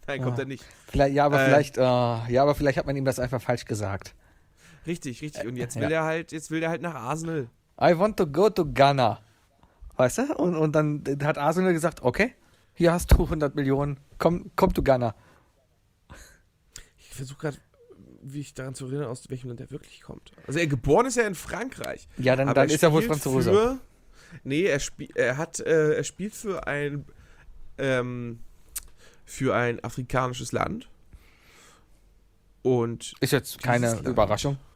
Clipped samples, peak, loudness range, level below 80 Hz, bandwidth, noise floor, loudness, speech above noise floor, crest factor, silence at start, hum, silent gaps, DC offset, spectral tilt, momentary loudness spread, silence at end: under 0.1%; -6 dBFS; 9 LU; -40 dBFS; 16.5 kHz; -65 dBFS; -25 LUFS; 41 dB; 20 dB; 0.05 s; none; none; under 0.1%; -5.5 dB/octave; 17 LU; 0.15 s